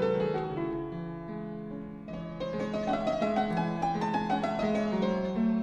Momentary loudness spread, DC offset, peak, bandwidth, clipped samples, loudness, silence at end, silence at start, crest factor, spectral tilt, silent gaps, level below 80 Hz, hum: 11 LU; under 0.1%; -16 dBFS; 8.8 kHz; under 0.1%; -32 LUFS; 0 s; 0 s; 16 dB; -7.5 dB/octave; none; -54 dBFS; none